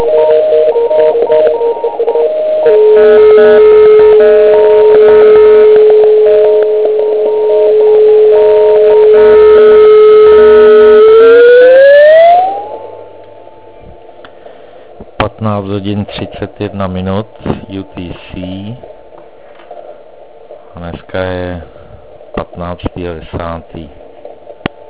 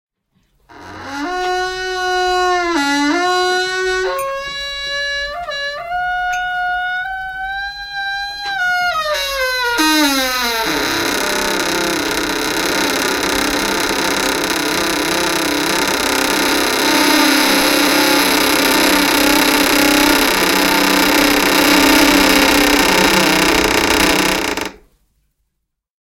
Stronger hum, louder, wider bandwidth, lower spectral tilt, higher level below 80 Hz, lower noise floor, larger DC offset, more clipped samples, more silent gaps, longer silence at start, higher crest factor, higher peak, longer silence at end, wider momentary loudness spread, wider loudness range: neither; first, -5 LUFS vs -14 LUFS; second, 4 kHz vs 17.5 kHz; first, -9.5 dB/octave vs -2 dB/octave; about the same, -36 dBFS vs -38 dBFS; second, -35 dBFS vs -74 dBFS; first, 1% vs under 0.1%; first, 3% vs under 0.1%; neither; second, 0 s vs 0.7 s; second, 6 dB vs 16 dB; about the same, 0 dBFS vs 0 dBFS; second, 0.35 s vs 1.3 s; first, 20 LU vs 10 LU; first, 20 LU vs 8 LU